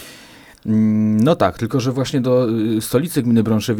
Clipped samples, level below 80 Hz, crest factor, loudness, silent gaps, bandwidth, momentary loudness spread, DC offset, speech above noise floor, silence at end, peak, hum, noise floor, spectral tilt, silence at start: under 0.1%; -50 dBFS; 16 dB; -17 LUFS; none; 18.5 kHz; 5 LU; under 0.1%; 26 dB; 0 s; 0 dBFS; none; -43 dBFS; -6.5 dB/octave; 0 s